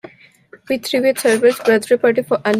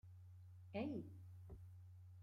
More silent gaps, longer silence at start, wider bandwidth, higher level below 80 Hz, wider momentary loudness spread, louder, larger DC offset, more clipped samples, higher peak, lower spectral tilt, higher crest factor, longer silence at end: neither; first, 0.7 s vs 0.05 s; first, 16 kHz vs 13.5 kHz; first, -64 dBFS vs -72 dBFS; second, 7 LU vs 15 LU; first, -16 LUFS vs -54 LUFS; neither; neither; first, -2 dBFS vs -34 dBFS; second, -4 dB/octave vs -8.5 dB/octave; second, 14 dB vs 20 dB; about the same, 0 s vs 0 s